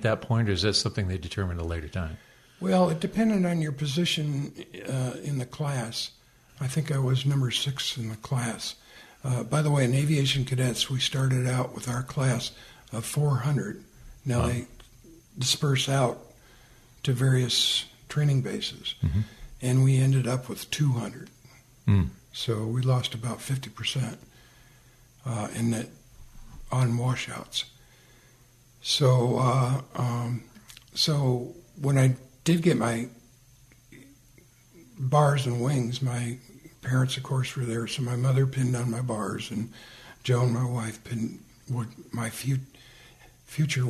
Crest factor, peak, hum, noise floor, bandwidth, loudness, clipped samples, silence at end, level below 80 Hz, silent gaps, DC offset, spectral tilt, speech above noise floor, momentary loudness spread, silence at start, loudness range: 20 dB; -8 dBFS; none; -57 dBFS; 13.5 kHz; -27 LUFS; under 0.1%; 0 s; -50 dBFS; none; under 0.1%; -5.5 dB/octave; 31 dB; 12 LU; 0 s; 5 LU